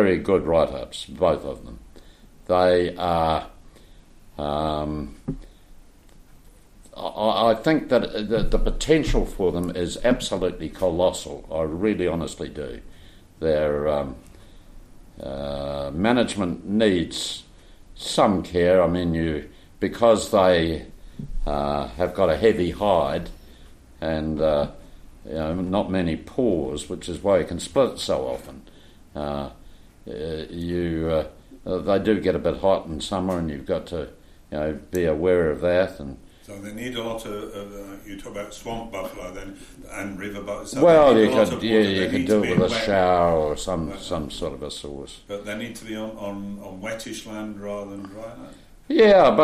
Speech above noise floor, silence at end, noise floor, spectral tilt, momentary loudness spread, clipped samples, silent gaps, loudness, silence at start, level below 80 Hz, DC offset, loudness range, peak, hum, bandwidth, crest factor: 26 dB; 0 s; -49 dBFS; -5.5 dB/octave; 17 LU; under 0.1%; none; -23 LUFS; 0 s; -38 dBFS; under 0.1%; 11 LU; -4 dBFS; none; 14.5 kHz; 18 dB